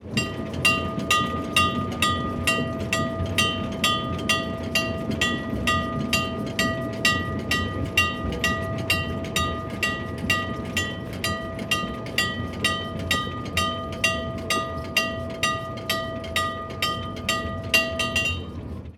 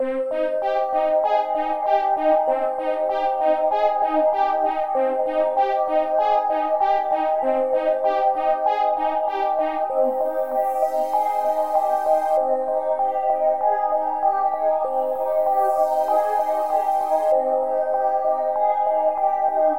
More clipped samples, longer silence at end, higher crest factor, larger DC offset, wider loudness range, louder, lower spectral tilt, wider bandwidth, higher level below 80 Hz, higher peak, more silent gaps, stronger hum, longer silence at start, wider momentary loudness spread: neither; about the same, 0 s vs 0 s; first, 20 dB vs 14 dB; second, under 0.1% vs 0.5%; about the same, 3 LU vs 1 LU; second, -24 LUFS vs -21 LUFS; about the same, -3.5 dB/octave vs -4 dB/octave; first, 19 kHz vs 16.5 kHz; first, -42 dBFS vs -62 dBFS; first, -4 dBFS vs -8 dBFS; neither; neither; about the same, 0 s vs 0 s; first, 6 LU vs 3 LU